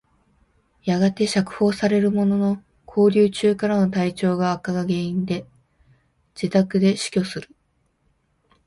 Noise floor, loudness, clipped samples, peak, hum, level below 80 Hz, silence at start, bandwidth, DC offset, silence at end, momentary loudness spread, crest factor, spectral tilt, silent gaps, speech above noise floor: -67 dBFS; -21 LUFS; under 0.1%; -4 dBFS; none; -58 dBFS; 0.85 s; 11.5 kHz; under 0.1%; 1.25 s; 10 LU; 18 dB; -6.5 dB/octave; none; 47 dB